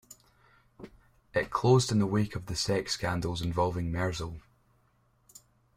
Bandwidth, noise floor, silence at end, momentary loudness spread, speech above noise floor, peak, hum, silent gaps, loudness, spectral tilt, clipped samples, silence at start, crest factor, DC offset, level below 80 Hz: 16 kHz; -68 dBFS; 1.4 s; 25 LU; 40 dB; -10 dBFS; none; none; -30 LUFS; -5.5 dB/octave; under 0.1%; 0.1 s; 22 dB; under 0.1%; -52 dBFS